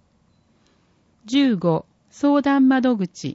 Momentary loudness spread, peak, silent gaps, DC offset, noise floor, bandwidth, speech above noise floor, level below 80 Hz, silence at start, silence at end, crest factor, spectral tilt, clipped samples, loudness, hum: 7 LU; -8 dBFS; none; under 0.1%; -61 dBFS; 8 kHz; 42 dB; -64 dBFS; 1.25 s; 0.05 s; 14 dB; -6.5 dB/octave; under 0.1%; -19 LUFS; none